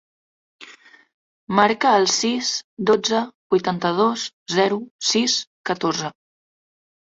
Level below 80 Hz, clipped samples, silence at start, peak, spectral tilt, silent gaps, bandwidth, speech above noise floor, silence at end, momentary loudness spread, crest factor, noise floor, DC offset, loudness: -64 dBFS; under 0.1%; 0.6 s; -2 dBFS; -3 dB/octave; 1.14-1.47 s, 2.64-2.77 s, 3.35-3.50 s, 4.33-4.46 s, 4.91-4.99 s, 5.47-5.64 s; 8 kHz; 28 dB; 1.1 s; 8 LU; 20 dB; -48 dBFS; under 0.1%; -20 LUFS